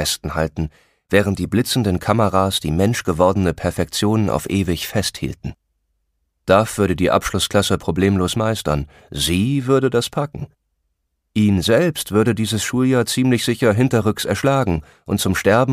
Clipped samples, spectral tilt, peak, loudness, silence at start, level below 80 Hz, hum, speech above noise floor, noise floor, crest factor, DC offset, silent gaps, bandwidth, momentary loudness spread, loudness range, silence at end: under 0.1%; -5 dB/octave; 0 dBFS; -18 LUFS; 0 s; -40 dBFS; none; 54 dB; -72 dBFS; 18 dB; under 0.1%; none; 15.5 kHz; 8 LU; 3 LU; 0 s